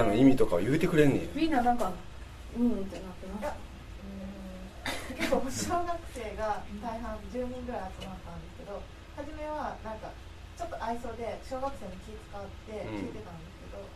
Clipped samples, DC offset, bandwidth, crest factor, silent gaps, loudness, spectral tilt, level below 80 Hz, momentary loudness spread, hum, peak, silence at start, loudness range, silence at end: under 0.1%; under 0.1%; 14 kHz; 22 dB; none; -32 LUFS; -6 dB/octave; -46 dBFS; 18 LU; none; -10 dBFS; 0 s; 10 LU; 0 s